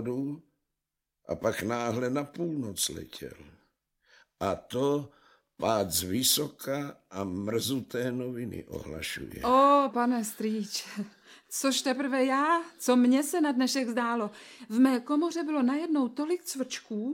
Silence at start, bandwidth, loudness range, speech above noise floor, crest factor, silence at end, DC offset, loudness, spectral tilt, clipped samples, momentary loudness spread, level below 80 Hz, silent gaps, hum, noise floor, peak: 0 s; 16.5 kHz; 7 LU; 57 dB; 18 dB; 0 s; under 0.1%; -29 LUFS; -4 dB/octave; under 0.1%; 13 LU; -62 dBFS; none; none; -86 dBFS; -10 dBFS